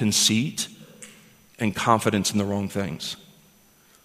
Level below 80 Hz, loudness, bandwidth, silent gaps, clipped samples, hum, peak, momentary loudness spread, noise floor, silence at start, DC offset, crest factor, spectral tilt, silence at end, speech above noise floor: -60 dBFS; -24 LUFS; 15.5 kHz; none; under 0.1%; none; -2 dBFS; 24 LU; -57 dBFS; 0 s; under 0.1%; 24 dB; -3.5 dB/octave; 0.9 s; 33 dB